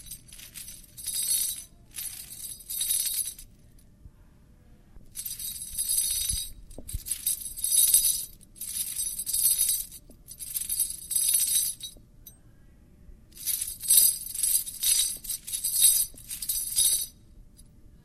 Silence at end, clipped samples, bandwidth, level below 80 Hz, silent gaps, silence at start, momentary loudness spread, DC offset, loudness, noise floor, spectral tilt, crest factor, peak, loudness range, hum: 0.1 s; under 0.1%; 15 kHz; -50 dBFS; none; 0 s; 20 LU; under 0.1%; -25 LUFS; -55 dBFS; 1.5 dB/octave; 26 dB; -4 dBFS; 9 LU; none